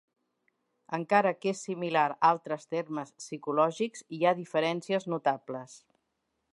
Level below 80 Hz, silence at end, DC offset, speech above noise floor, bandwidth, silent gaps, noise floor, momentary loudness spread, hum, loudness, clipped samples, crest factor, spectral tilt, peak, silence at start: -84 dBFS; 0.8 s; under 0.1%; 51 dB; 11.5 kHz; none; -80 dBFS; 12 LU; none; -30 LUFS; under 0.1%; 22 dB; -5 dB/octave; -8 dBFS; 0.9 s